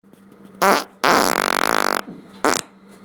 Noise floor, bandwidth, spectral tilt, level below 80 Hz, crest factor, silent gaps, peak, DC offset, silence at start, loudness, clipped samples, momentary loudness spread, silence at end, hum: -46 dBFS; over 20 kHz; -2 dB/octave; -56 dBFS; 20 dB; none; 0 dBFS; under 0.1%; 0.6 s; -19 LUFS; under 0.1%; 8 LU; 0.4 s; none